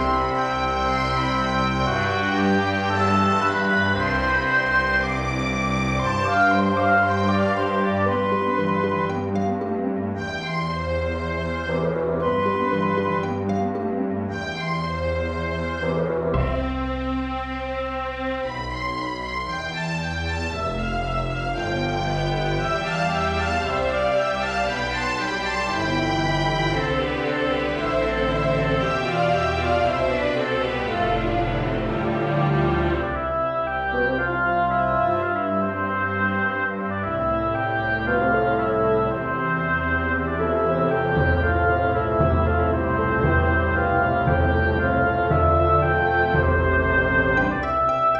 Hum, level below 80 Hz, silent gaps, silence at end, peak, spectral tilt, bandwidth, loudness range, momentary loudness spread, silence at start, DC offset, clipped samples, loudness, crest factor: none; -36 dBFS; none; 0 s; -6 dBFS; -6.5 dB/octave; 10 kHz; 5 LU; 7 LU; 0 s; under 0.1%; under 0.1%; -22 LUFS; 16 dB